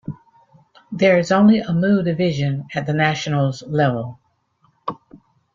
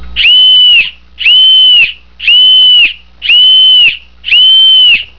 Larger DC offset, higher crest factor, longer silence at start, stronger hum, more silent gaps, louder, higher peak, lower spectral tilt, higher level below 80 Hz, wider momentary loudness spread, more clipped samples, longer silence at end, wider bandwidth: second, under 0.1% vs 2%; first, 18 dB vs 6 dB; about the same, 0.1 s vs 0 s; neither; neither; second, -18 LUFS vs -2 LUFS; about the same, -2 dBFS vs 0 dBFS; first, -7 dB/octave vs -0.5 dB/octave; second, -56 dBFS vs -38 dBFS; first, 18 LU vs 9 LU; neither; first, 0.4 s vs 0.15 s; first, 7.6 kHz vs 5.4 kHz